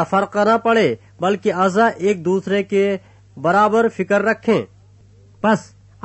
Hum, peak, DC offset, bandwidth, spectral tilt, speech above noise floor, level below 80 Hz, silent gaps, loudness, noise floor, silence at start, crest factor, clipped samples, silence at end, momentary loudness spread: none; -4 dBFS; under 0.1%; 8.4 kHz; -6 dB/octave; 31 dB; -60 dBFS; none; -18 LUFS; -48 dBFS; 0 s; 14 dB; under 0.1%; 0.4 s; 7 LU